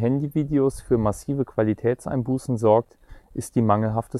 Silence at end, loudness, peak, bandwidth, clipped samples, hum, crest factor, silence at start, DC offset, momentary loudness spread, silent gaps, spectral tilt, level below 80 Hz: 0 s; -23 LUFS; -4 dBFS; 14 kHz; under 0.1%; none; 18 dB; 0 s; under 0.1%; 7 LU; none; -8 dB/octave; -46 dBFS